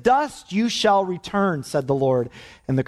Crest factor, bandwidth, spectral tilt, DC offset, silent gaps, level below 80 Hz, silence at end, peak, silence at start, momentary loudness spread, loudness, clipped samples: 16 dB; 13.5 kHz; -5.5 dB/octave; under 0.1%; none; -54 dBFS; 0.05 s; -6 dBFS; 0 s; 7 LU; -22 LUFS; under 0.1%